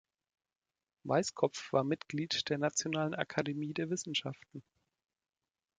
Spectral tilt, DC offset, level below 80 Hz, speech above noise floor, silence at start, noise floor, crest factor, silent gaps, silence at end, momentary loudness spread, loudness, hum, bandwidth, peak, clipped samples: -4 dB/octave; under 0.1%; -76 dBFS; over 55 dB; 1.05 s; under -90 dBFS; 24 dB; none; 1.15 s; 13 LU; -35 LUFS; none; 9.4 kHz; -14 dBFS; under 0.1%